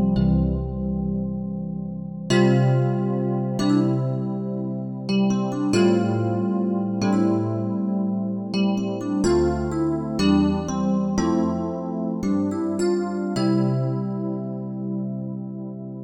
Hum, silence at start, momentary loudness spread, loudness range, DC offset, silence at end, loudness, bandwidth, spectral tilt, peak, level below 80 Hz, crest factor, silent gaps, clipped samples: none; 0 s; 10 LU; 2 LU; under 0.1%; 0 s; -23 LUFS; 10.5 kHz; -7.5 dB/octave; -6 dBFS; -40 dBFS; 16 dB; none; under 0.1%